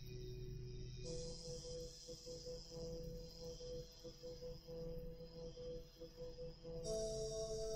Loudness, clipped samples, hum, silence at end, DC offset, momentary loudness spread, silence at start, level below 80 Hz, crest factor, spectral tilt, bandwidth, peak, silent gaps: -51 LUFS; under 0.1%; none; 0 s; under 0.1%; 9 LU; 0 s; -56 dBFS; 16 dB; -5 dB/octave; 16 kHz; -34 dBFS; none